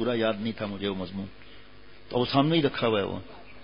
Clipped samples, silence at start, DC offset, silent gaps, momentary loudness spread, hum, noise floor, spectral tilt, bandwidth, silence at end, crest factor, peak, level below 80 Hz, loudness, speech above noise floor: under 0.1%; 0 s; 0.5%; none; 15 LU; none; -52 dBFS; -10.5 dB/octave; 5.4 kHz; 0 s; 18 dB; -10 dBFS; -56 dBFS; -27 LUFS; 25 dB